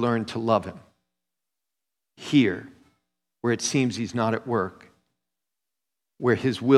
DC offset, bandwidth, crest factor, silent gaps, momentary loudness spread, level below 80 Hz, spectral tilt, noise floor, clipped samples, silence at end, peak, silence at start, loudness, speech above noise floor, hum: under 0.1%; 12.5 kHz; 22 dB; none; 11 LU; -66 dBFS; -5.5 dB/octave; -87 dBFS; under 0.1%; 0 s; -4 dBFS; 0 s; -25 LUFS; 64 dB; none